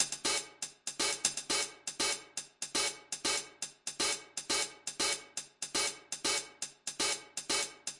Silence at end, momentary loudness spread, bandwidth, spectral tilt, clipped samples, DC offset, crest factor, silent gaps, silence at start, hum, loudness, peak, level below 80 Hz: 0 s; 8 LU; 11.5 kHz; 0.5 dB/octave; under 0.1%; under 0.1%; 26 dB; none; 0 s; none; -34 LUFS; -12 dBFS; -72 dBFS